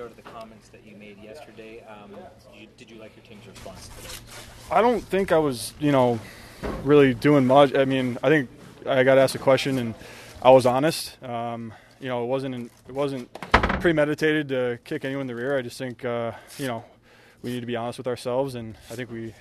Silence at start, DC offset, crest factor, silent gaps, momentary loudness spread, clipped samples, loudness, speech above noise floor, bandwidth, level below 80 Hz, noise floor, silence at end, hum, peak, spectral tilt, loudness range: 0 s; under 0.1%; 24 dB; none; 25 LU; under 0.1%; -23 LUFS; 30 dB; 13.5 kHz; -46 dBFS; -54 dBFS; 0.1 s; none; 0 dBFS; -6 dB/octave; 11 LU